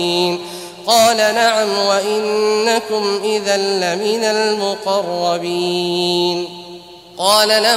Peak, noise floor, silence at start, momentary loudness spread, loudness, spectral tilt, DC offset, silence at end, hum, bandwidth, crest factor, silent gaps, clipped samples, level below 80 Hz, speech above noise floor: 0 dBFS; -36 dBFS; 0 s; 12 LU; -16 LUFS; -2.5 dB/octave; under 0.1%; 0 s; none; 16 kHz; 16 dB; none; under 0.1%; -62 dBFS; 21 dB